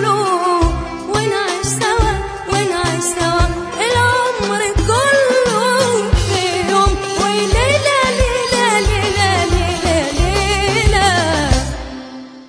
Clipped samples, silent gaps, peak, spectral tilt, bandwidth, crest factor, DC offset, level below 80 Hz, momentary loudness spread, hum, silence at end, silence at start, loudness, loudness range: under 0.1%; none; 0 dBFS; -4 dB/octave; 11 kHz; 14 dB; under 0.1%; -24 dBFS; 6 LU; none; 0.05 s; 0 s; -15 LUFS; 2 LU